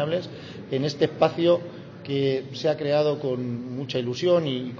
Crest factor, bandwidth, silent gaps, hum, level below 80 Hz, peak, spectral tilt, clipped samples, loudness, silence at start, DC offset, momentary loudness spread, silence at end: 18 dB; 7.4 kHz; none; none; -64 dBFS; -6 dBFS; -6.5 dB/octave; under 0.1%; -25 LUFS; 0 s; under 0.1%; 9 LU; 0 s